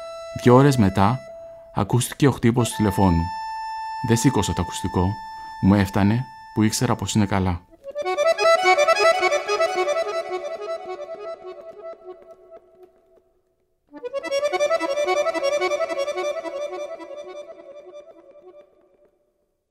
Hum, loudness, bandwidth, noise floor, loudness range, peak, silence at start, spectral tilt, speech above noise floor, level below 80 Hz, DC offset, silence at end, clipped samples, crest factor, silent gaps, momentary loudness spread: none; -21 LUFS; 16 kHz; -69 dBFS; 15 LU; -2 dBFS; 0 s; -5.5 dB/octave; 50 dB; -46 dBFS; under 0.1%; 1.1 s; under 0.1%; 20 dB; none; 20 LU